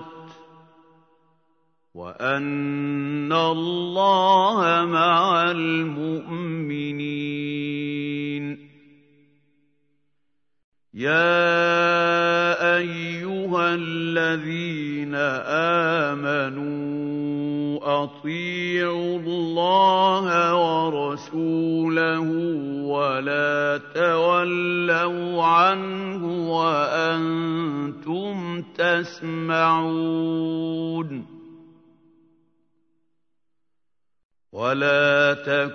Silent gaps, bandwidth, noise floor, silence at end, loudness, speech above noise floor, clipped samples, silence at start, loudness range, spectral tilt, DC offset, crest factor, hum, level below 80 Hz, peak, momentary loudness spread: 10.64-10.72 s, 34.25-34.30 s; 6.6 kHz; -86 dBFS; 0 s; -22 LUFS; 64 dB; under 0.1%; 0 s; 9 LU; -6 dB/octave; under 0.1%; 18 dB; none; -74 dBFS; -6 dBFS; 11 LU